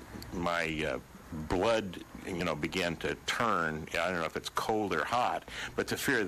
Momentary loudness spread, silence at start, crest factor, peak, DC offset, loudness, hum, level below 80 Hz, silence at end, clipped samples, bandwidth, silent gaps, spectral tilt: 10 LU; 0 s; 18 dB; -16 dBFS; under 0.1%; -33 LUFS; none; -52 dBFS; 0 s; under 0.1%; 15 kHz; none; -4 dB/octave